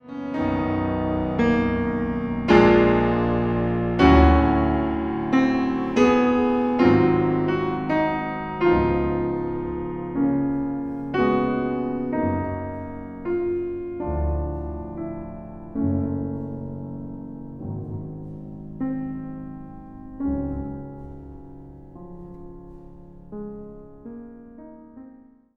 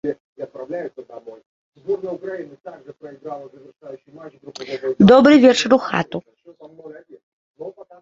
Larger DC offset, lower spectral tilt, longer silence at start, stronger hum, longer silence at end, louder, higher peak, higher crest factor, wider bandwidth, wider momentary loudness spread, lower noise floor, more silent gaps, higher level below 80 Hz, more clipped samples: neither; first, -8.5 dB/octave vs -6 dB/octave; about the same, 0.05 s vs 0.05 s; neither; first, 0.45 s vs 0.3 s; second, -23 LUFS vs -16 LUFS; about the same, -2 dBFS vs -2 dBFS; about the same, 20 dB vs 18 dB; about the same, 7.2 kHz vs 7.8 kHz; second, 23 LU vs 28 LU; first, -49 dBFS vs -44 dBFS; second, none vs 0.20-0.36 s, 1.46-1.72 s, 7.23-7.54 s; first, -34 dBFS vs -56 dBFS; neither